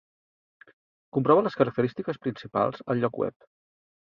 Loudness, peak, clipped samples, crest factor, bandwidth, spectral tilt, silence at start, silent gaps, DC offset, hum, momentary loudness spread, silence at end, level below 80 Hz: -27 LUFS; -6 dBFS; under 0.1%; 22 dB; 6.8 kHz; -9 dB/octave; 1.15 s; none; under 0.1%; none; 11 LU; 0.85 s; -66 dBFS